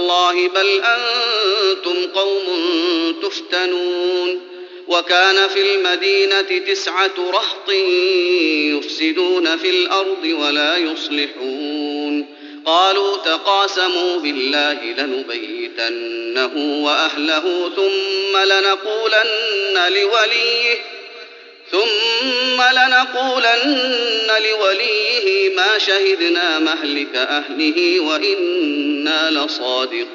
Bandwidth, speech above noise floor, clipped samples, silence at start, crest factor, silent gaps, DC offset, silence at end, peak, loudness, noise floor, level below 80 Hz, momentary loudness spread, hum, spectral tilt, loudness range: 7.6 kHz; 22 dB; under 0.1%; 0 s; 16 dB; none; under 0.1%; 0 s; -2 dBFS; -16 LUFS; -39 dBFS; -78 dBFS; 8 LU; none; 3.5 dB/octave; 4 LU